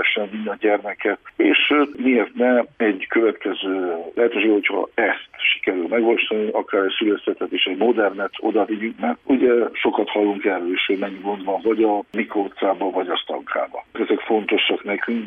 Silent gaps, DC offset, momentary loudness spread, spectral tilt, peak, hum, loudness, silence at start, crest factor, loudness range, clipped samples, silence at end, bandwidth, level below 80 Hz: none; under 0.1%; 7 LU; -7 dB/octave; -4 dBFS; none; -20 LUFS; 0 s; 16 dB; 3 LU; under 0.1%; 0 s; 3.8 kHz; -66 dBFS